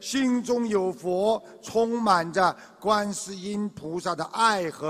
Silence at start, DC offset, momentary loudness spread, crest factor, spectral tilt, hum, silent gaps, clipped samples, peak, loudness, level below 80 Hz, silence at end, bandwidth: 0 s; under 0.1%; 9 LU; 20 dB; -4 dB/octave; none; none; under 0.1%; -6 dBFS; -26 LUFS; -64 dBFS; 0 s; 15 kHz